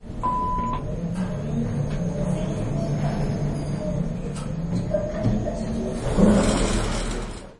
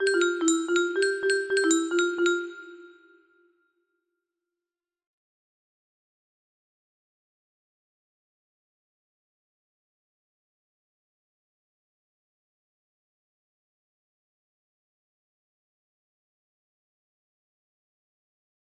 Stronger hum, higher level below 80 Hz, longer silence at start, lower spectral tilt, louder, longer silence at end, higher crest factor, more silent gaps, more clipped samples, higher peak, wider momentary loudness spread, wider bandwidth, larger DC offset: neither; first, -32 dBFS vs -80 dBFS; about the same, 0 s vs 0 s; first, -6.5 dB/octave vs -0.5 dB/octave; about the same, -25 LUFS vs -25 LUFS; second, 0.05 s vs 15.85 s; about the same, 20 dB vs 22 dB; neither; neither; first, -4 dBFS vs -10 dBFS; first, 9 LU vs 5 LU; about the same, 11.5 kHz vs 12.5 kHz; neither